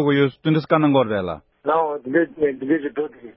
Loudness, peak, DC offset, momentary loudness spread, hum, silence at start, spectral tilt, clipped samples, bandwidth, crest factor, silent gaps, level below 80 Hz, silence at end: -21 LUFS; -4 dBFS; under 0.1%; 10 LU; none; 0 s; -12 dB/octave; under 0.1%; 5.8 kHz; 16 dB; none; -56 dBFS; 0.05 s